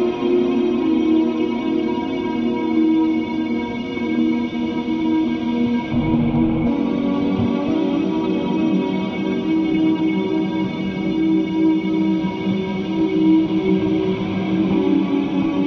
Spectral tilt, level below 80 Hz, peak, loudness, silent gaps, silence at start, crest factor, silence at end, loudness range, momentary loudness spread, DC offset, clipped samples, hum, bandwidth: -8 dB/octave; -44 dBFS; -6 dBFS; -19 LUFS; none; 0 s; 12 dB; 0 s; 2 LU; 5 LU; under 0.1%; under 0.1%; none; 6.2 kHz